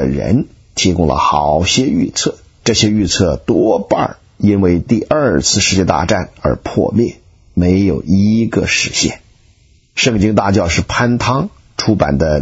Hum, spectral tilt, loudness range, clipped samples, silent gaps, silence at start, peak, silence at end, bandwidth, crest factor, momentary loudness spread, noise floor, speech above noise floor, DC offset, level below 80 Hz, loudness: none; -4.5 dB/octave; 2 LU; under 0.1%; none; 0 s; 0 dBFS; 0 s; 8 kHz; 14 dB; 7 LU; -50 dBFS; 37 dB; under 0.1%; -32 dBFS; -14 LUFS